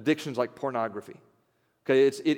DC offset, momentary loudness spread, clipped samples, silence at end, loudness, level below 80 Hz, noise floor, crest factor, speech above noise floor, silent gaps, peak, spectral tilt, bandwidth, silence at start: under 0.1%; 15 LU; under 0.1%; 0 s; -27 LUFS; -82 dBFS; -71 dBFS; 16 dB; 44 dB; none; -12 dBFS; -5.5 dB/octave; 15.5 kHz; 0 s